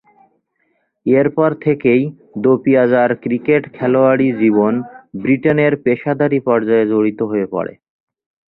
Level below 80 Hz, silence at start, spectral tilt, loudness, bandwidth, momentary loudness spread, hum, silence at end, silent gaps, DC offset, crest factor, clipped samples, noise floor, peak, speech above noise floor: -58 dBFS; 1.05 s; -11.5 dB/octave; -15 LUFS; 4.1 kHz; 9 LU; none; 0.8 s; none; under 0.1%; 14 dB; under 0.1%; -65 dBFS; -2 dBFS; 51 dB